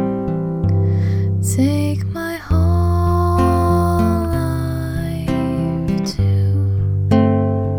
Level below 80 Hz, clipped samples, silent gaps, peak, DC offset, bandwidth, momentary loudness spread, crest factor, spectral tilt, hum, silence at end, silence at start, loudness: -30 dBFS; under 0.1%; none; -2 dBFS; under 0.1%; 16 kHz; 6 LU; 14 dB; -7.5 dB/octave; none; 0 s; 0 s; -18 LUFS